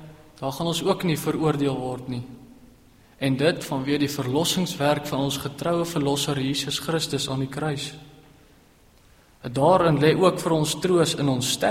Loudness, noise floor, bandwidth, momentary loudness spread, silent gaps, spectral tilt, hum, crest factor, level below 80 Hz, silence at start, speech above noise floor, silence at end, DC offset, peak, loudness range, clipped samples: -24 LUFS; -55 dBFS; 16 kHz; 12 LU; none; -5 dB/octave; none; 18 dB; -54 dBFS; 0 s; 32 dB; 0 s; under 0.1%; -6 dBFS; 5 LU; under 0.1%